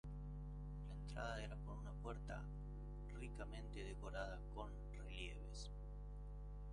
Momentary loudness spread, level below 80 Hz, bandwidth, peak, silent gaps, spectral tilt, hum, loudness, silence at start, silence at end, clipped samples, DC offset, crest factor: 6 LU; -52 dBFS; 10.5 kHz; -34 dBFS; none; -6 dB/octave; 50 Hz at -50 dBFS; -52 LUFS; 0.05 s; 0 s; under 0.1%; under 0.1%; 16 dB